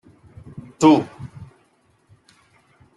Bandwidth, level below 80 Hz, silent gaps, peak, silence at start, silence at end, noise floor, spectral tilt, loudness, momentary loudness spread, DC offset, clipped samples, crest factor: 11.5 kHz; -58 dBFS; none; -2 dBFS; 0.8 s; 1.5 s; -61 dBFS; -6 dB/octave; -17 LUFS; 26 LU; under 0.1%; under 0.1%; 20 dB